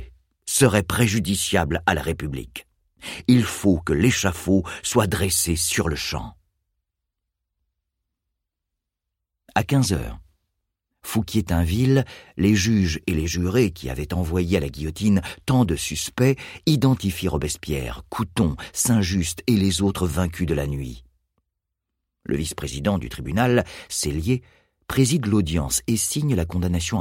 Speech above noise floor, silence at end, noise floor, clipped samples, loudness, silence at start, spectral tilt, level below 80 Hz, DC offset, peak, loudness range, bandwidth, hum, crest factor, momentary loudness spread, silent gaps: 61 dB; 0 s; -83 dBFS; under 0.1%; -22 LUFS; 0 s; -5 dB/octave; -38 dBFS; under 0.1%; -2 dBFS; 7 LU; 16.5 kHz; none; 20 dB; 9 LU; none